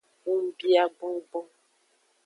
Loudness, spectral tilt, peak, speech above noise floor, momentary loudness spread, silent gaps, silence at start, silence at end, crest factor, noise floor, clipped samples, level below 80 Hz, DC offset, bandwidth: -27 LUFS; -3.5 dB/octave; -10 dBFS; 42 dB; 14 LU; none; 0.25 s; 0.8 s; 18 dB; -68 dBFS; under 0.1%; -90 dBFS; under 0.1%; 10.5 kHz